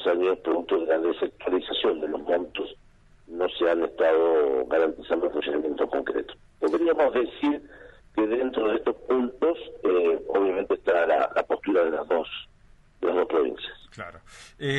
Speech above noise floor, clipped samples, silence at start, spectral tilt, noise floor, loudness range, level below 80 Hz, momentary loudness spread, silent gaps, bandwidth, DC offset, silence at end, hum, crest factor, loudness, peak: 30 dB; under 0.1%; 0 s; -6 dB/octave; -55 dBFS; 3 LU; -56 dBFS; 11 LU; none; 9 kHz; under 0.1%; 0 s; none; 14 dB; -25 LUFS; -10 dBFS